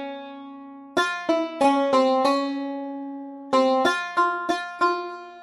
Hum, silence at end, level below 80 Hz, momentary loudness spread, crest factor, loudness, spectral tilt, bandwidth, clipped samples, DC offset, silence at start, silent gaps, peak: none; 0 s; -70 dBFS; 17 LU; 16 dB; -23 LUFS; -3.5 dB/octave; 14.5 kHz; under 0.1%; under 0.1%; 0 s; none; -6 dBFS